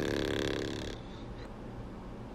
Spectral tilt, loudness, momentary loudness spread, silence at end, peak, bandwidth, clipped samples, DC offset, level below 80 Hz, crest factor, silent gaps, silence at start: -5 dB/octave; -38 LUFS; 12 LU; 0 s; -18 dBFS; 16 kHz; under 0.1%; under 0.1%; -48 dBFS; 20 dB; none; 0 s